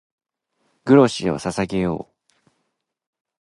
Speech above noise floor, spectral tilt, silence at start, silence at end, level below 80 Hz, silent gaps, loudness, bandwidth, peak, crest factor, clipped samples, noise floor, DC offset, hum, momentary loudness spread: 57 dB; -6.5 dB/octave; 0.85 s; 1.4 s; -52 dBFS; none; -19 LUFS; 11.5 kHz; -2 dBFS; 20 dB; under 0.1%; -75 dBFS; under 0.1%; none; 14 LU